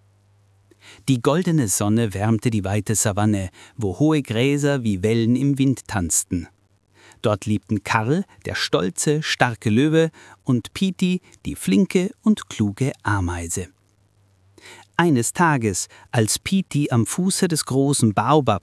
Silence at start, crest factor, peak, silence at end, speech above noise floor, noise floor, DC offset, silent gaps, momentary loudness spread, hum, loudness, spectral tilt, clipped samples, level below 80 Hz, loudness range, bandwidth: 0.85 s; 20 dB; 0 dBFS; 0.05 s; 39 dB; -60 dBFS; under 0.1%; none; 8 LU; none; -21 LUFS; -5 dB/octave; under 0.1%; -54 dBFS; 3 LU; 12 kHz